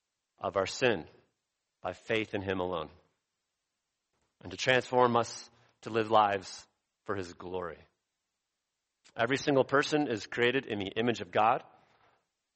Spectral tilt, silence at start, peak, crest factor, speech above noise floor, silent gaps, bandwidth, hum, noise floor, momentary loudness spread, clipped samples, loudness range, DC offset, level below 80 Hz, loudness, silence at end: -4.5 dB/octave; 0.4 s; -10 dBFS; 22 dB; 56 dB; none; 8.4 kHz; none; -86 dBFS; 18 LU; under 0.1%; 8 LU; under 0.1%; -70 dBFS; -31 LUFS; 0.95 s